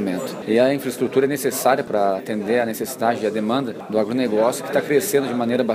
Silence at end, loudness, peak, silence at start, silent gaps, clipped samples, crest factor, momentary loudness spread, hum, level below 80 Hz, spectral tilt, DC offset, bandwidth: 0 s; -21 LUFS; -4 dBFS; 0 s; none; under 0.1%; 16 dB; 5 LU; none; -68 dBFS; -4.5 dB/octave; under 0.1%; 15.5 kHz